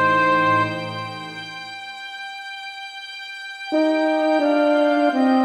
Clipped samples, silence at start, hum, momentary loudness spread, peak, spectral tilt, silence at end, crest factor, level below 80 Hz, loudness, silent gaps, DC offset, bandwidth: under 0.1%; 0 s; none; 15 LU; -6 dBFS; -5.5 dB/octave; 0 s; 14 dB; -64 dBFS; -20 LUFS; none; under 0.1%; 11.5 kHz